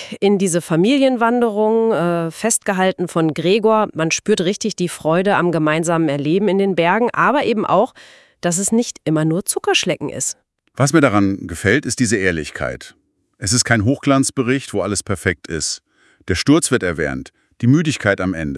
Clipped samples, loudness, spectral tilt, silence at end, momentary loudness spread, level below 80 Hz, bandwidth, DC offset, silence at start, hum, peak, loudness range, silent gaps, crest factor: under 0.1%; -17 LUFS; -4.5 dB/octave; 0 s; 8 LU; -50 dBFS; 12 kHz; under 0.1%; 0 s; none; 0 dBFS; 2 LU; none; 18 dB